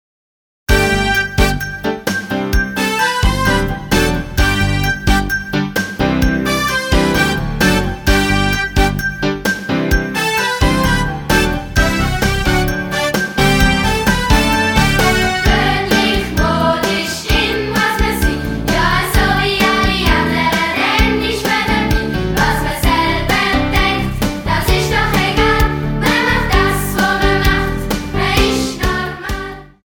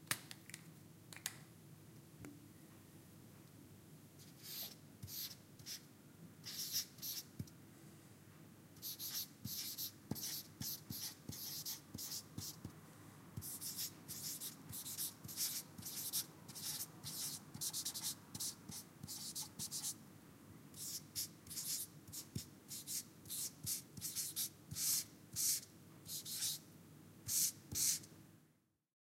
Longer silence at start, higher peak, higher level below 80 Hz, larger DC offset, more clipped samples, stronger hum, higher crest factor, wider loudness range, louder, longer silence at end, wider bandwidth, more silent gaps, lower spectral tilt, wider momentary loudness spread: first, 0.7 s vs 0 s; first, 0 dBFS vs -16 dBFS; first, -22 dBFS vs -76 dBFS; neither; neither; neither; second, 14 dB vs 32 dB; second, 2 LU vs 11 LU; first, -15 LUFS vs -44 LUFS; second, 0.2 s vs 0.55 s; first, over 20 kHz vs 16.5 kHz; neither; first, -4.5 dB/octave vs -1 dB/octave; second, 5 LU vs 22 LU